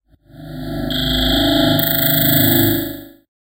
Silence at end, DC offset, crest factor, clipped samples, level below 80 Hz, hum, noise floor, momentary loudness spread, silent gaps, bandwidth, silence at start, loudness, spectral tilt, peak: 0.45 s; under 0.1%; 16 dB; under 0.1%; -32 dBFS; none; -38 dBFS; 16 LU; none; 16.5 kHz; 0.35 s; -14 LUFS; -4.5 dB/octave; 0 dBFS